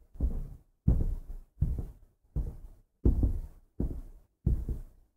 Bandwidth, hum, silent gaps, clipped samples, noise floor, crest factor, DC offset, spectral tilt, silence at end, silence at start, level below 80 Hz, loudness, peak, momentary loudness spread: 1.8 kHz; none; none; under 0.1%; -53 dBFS; 22 dB; under 0.1%; -11 dB/octave; 0.25 s; 0.15 s; -34 dBFS; -35 LUFS; -10 dBFS; 17 LU